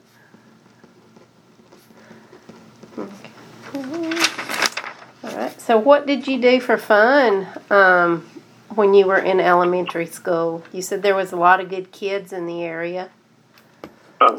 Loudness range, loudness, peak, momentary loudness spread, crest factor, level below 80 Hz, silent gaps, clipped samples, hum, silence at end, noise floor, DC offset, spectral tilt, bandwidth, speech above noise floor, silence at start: 9 LU; -18 LUFS; 0 dBFS; 18 LU; 20 dB; -76 dBFS; none; under 0.1%; none; 0 s; -53 dBFS; under 0.1%; -4 dB/octave; 18 kHz; 36 dB; 2.95 s